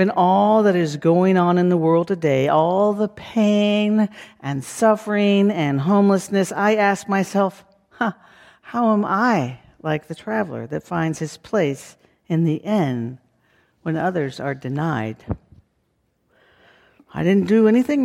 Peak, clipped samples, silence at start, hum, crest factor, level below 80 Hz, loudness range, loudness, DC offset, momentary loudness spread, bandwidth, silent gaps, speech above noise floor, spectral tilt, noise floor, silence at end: -4 dBFS; under 0.1%; 0 s; none; 16 dB; -54 dBFS; 8 LU; -19 LUFS; under 0.1%; 12 LU; 13.5 kHz; none; 49 dB; -6.5 dB/octave; -68 dBFS; 0 s